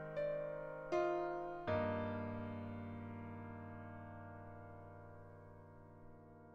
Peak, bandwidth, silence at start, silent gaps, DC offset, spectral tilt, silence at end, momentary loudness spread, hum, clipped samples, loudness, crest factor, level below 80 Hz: -26 dBFS; 7.2 kHz; 0 s; none; under 0.1%; -8 dB/octave; 0 s; 20 LU; none; under 0.1%; -44 LUFS; 18 dB; -68 dBFS